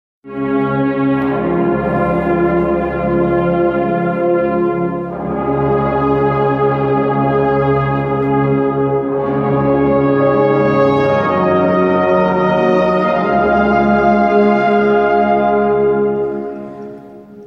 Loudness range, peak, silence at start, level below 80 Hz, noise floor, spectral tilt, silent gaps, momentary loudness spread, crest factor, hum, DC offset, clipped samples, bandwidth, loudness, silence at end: 3 LU; -2 dBFS; 0.25 s; -38 dBFS; -35 dBFS; -9.5 dB/octave; none; 5 LU; 12 dB; none; under 0.1%; under 0.1%; 6.4 kHz; -14 LUFS; 0 s